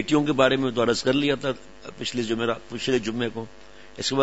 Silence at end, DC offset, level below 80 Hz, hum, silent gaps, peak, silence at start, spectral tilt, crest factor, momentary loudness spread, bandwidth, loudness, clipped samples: 0 s; 0.5%; -54 dBFS; none; none; -6 dBFS; 0 s; -4.5 dB/octave; 20 dB; 16 LU; 8 kHz; -24 LUFS; under 0.1%